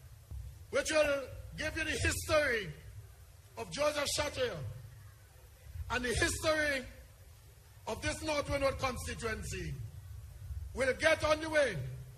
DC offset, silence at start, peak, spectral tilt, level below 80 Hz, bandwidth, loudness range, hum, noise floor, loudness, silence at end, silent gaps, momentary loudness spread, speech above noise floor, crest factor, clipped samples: under 0.1%; 0 s; -14 dBFS; -3.5 dB/octave; -50 dBFS; 14.5 kHz; 4 LU; none; -57 dBFS; -34 LUFS; 0 s; none; 19 LU; 23 dB; 20 dB; under 0.1%